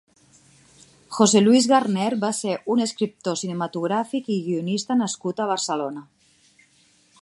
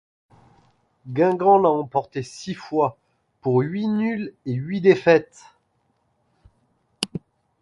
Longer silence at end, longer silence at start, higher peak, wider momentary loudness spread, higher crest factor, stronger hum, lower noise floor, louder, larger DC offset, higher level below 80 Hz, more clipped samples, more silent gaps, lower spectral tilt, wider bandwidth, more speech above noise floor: first, 1.2 s vs 0.45 s; about the same, 1.1 s vs 1.05 s; about the same, -2 dBFS vs -2 dBFS; second, 11 LU vs 15 LU; about the same, 20 dB vs 22 dB; neither; second, -59 dBFS vs -68 dBFS; about the same, -22 LUFS vs -22 LUFS; neither; second, -72 dBFS vs -64 dBFS; neither; neither; second, -4.5 dB/octave vs -6.5 dB/octave; about the same, 11.5 kHz vs 11.5 kHz; second, 38 dB vs 48 dB